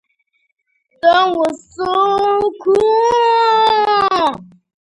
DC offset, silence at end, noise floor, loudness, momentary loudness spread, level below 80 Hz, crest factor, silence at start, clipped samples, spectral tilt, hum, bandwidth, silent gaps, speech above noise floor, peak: under 0.1%; 0.4 s; -65 dBFS; -14 LUFS; 7 LU; -54 dBFS; 14 dB; 1.05 s; under 0.1%; -4 dB/octave; none; 11 kHz; none; 51 dB; 0 dBFS